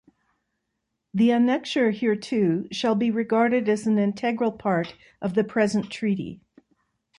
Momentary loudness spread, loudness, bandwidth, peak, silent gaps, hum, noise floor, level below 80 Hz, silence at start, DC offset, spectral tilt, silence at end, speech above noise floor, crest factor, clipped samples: 6 LU; -24 LUFS; 10.5 kHz; -8 dBFS; none; none; -79 dBFS; -64 dBFS; 1.15 s; under 0.1%; -6.5 dB/octave; 0.85 s; 56 dB; 16 dB; under 0.1%